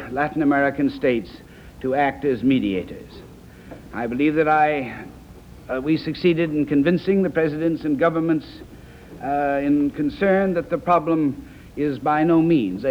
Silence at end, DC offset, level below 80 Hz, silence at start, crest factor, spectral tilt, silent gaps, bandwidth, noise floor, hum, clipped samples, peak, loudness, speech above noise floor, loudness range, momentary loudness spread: 0 s; under 0.1%; -48 dBFS; 0 s; 16 dB; -8 dB/octave; none; 8.8 kHz; -42 dBFS; none; under 0.1%; -6 dBFS; -21 LUFS; 22 dB; 3 LU; 18 LU